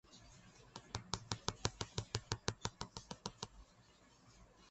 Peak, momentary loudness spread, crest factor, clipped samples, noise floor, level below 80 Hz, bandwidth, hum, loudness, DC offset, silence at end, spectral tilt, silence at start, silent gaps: -16 dBFS; 23 LU; 32 dB; under 0.1%; -67 dBFS; -60 dBFS; 8.4 kHz; none; -45 LUFS; under 0.1%; 0 s; -3.5 dB/octave; 0.1 s; none